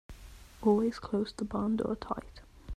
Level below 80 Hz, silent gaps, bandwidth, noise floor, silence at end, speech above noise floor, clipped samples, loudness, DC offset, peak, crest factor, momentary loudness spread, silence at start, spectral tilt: -52 dBFS; none; 12.5 kHz; -51 dBFS; 0 s; 19 dB; under 0.1%; -32 LUFS; under 0.1%; -16 dBFS; 18 dB; 23 LU; 0.1 s; -7 dB/octave